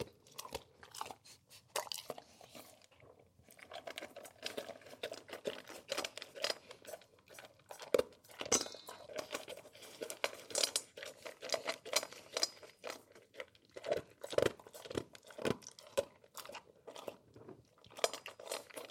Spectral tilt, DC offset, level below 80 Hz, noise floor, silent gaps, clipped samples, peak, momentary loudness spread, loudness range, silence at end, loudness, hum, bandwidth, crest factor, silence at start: -1.5 dB/octave; under 0.1%; -74 dBFS; -64 dBFS; none; under 0.1%; -14 dBFS; 20 LU; 9 LU; 0 s; -42 LUFS; none; 16.5 kHz; 30 dB; 0 s